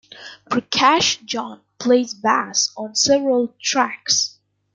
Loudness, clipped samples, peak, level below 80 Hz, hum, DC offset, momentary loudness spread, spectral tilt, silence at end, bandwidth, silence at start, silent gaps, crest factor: -18 LUFS; under 0.1%; -2 dBFS; -62 dBFS; none; under 0.1%; 11 LU; -1.5 dB/octave; 0.45 s; 11 kHz; 0.15 s; none; 18 dB